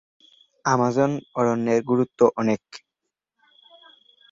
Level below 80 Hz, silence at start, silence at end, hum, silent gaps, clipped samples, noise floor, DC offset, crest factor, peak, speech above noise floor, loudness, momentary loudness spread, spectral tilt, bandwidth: -66 dBFS; 0.65 s; 1.55 s; none; none; under 0.1%; -83 dBFS; under 0.1%; 20 dB; -4 dBFS; 62 dB; -22 LUFS; 10 LU; -6.5 dB/octave; 7.8 kHz